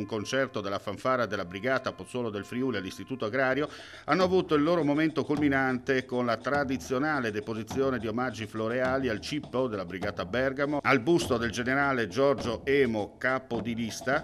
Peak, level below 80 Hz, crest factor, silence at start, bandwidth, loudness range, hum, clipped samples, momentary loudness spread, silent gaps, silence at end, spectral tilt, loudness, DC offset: -10 dBFS; -60 dBFS; 20 dB; 0 s; 14 kHz; 4 LU; none; under 0.1%; 9 LU; none; 0 s; -5.5 dB/octave; -29 LUFS; under 0.1%